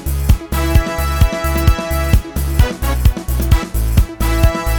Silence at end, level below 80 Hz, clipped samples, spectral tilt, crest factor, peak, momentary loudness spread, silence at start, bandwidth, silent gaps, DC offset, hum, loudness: 0 s; -16 dBFS; under 0.1%; -5.5 dB/octave; 14 dB; 0 dBFS; 2 LU; 0 s; over 20 kHz; none; under 0.1%; none; -16 LUFS